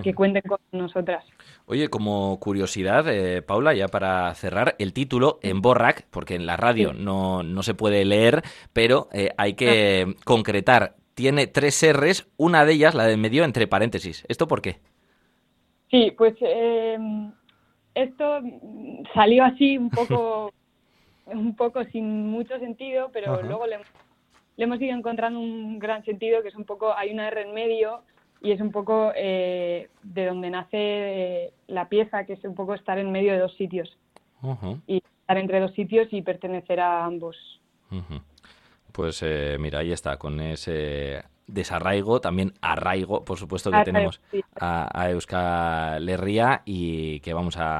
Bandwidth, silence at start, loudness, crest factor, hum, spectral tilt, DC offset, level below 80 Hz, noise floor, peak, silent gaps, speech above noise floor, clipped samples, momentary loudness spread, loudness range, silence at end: 13 kHz; 0 s; -23 LUFS; 22 dB; none; -5.5 dB/octave; under 0.1%; -50 dBFS; -67 dBFS; -2 dBFS; none; 44 dB; under 0.1%; 14 LU; 9 LU; 0 s